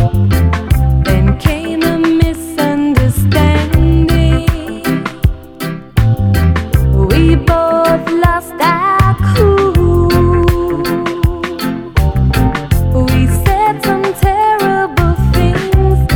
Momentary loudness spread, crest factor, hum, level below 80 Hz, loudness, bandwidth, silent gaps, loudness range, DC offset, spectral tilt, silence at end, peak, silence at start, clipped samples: 6 LU; 10 dB; none; -18 dBFS; -12 LUFS; 20 kHz; none; 2 LU; under 0.1%; -7 dB/octave; 0 s; 0 dBFS; 0 s; 0.2%